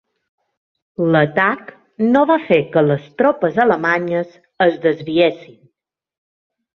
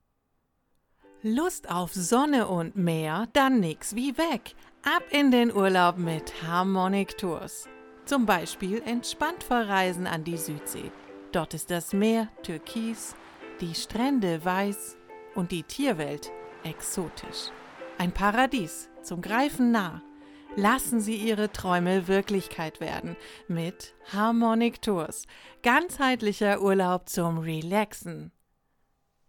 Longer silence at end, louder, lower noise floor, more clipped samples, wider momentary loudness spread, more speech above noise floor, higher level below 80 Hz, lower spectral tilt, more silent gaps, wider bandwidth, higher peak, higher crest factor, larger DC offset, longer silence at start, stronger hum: first, 1.3 s vs 1 s; first, -16 LUFS vs -27 LUFS; about the same, -75 dBFS vs -74 dBFS; neither; second, 8 LU vs 15 LU; first, 59 dB vs 47 dB; second, -60 dBFS vs -54 dBFS; first, -8 dB/octave vs -4.5 dB/octave; neither; second, 6.4 kHz vs 19 kHz; first, -2 dBFS vs -8 dBFS; about the same, 16 dB vs 20 dB; neither; second, 1 s vs 1.25 s; neither